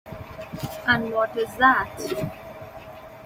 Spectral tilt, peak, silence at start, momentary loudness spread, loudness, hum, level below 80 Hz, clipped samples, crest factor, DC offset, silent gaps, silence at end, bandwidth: -5 dB/octave; -6 dBFS; 0.05 s; 22 LU; -23 LUFS; none; -52 dBFS; under 0.1%; 20 dB; under 0.1%; none; 0 s; 16.5 kHz